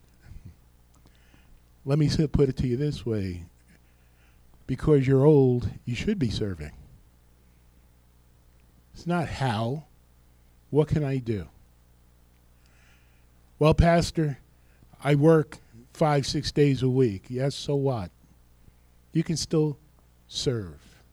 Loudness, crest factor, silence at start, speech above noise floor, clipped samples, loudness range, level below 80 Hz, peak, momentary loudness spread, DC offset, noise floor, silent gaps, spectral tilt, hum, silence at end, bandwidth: -25 LUFS; 22 dB; 0.3 s; 34 dB; under 0.1%; 9 LU; -42 dBFS; -6 dBFS; 16 LU; under 0.1%; -58 dBFS; none; -7 dB/octave; 60 Hz at -55 dBFS; 0.35 s; 12.5 kHz